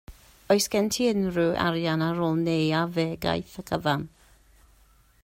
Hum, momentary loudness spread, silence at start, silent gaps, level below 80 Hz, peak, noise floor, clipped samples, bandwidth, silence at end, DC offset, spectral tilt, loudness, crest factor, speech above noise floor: none; 6 LU; 0.1 s; none; -54 dBFS; -8 dBFS; -59 dBFS; under 0.1%; 16 kHz; 1.15 s; under 0.1%; -5 dB/octave; -26 LUFS; 18 dB; 34 dB